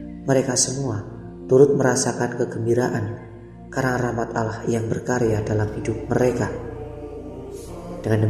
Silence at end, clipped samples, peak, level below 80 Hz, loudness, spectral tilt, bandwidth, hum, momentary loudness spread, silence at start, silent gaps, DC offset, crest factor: 0 s; under 0.1%; -4 dBFS; -44 dBFS; -22 LUFS; -5.5 dB/octave; 14 kHz; none; 17 LU; 0 s; none; under 0.1%; 20 dB